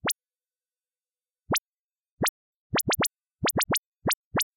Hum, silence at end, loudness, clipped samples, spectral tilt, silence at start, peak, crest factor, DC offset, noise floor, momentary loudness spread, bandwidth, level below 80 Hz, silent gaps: none; 0.15 s; -28 LUFS; under 0.1%; -2.5 dB/octave; 0.05 s; -18 dBFS; 14 dB; under 0.1%; under -90 dBFS; 5 LU; 17 kHz; -58 dBFS; 1.60-1.73 s, 1.79-1.89 s, 2.11-2.17 s, 2.29-2.70 s, 3.78-3.97 s, 4.15-4.31 s